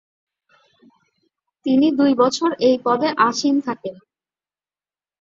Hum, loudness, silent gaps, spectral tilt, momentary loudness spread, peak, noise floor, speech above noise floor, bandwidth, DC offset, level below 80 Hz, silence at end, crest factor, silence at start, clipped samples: none; -18 LUFS; none; -4.5 dB/octave; 13 LU; -4 dBFS; under -90 dBFS; over 72 dB; 7.8 kHz; under 0.1%; -66 dBFS; 1.3 s; 18 dB; 1.65 s; under 0.1%